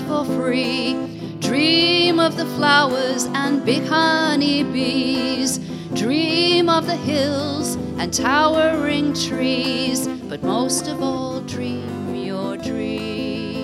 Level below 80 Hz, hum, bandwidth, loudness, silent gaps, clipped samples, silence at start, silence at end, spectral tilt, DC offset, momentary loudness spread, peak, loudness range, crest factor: -52 dBFS; none; 15.5 kHz; -19 LUFS; none; under 0.1%; 0 s; 0 s; -4 dB/octave; under 0.1%; 11 LU; -2 dBFS; 6 LU; 18 dB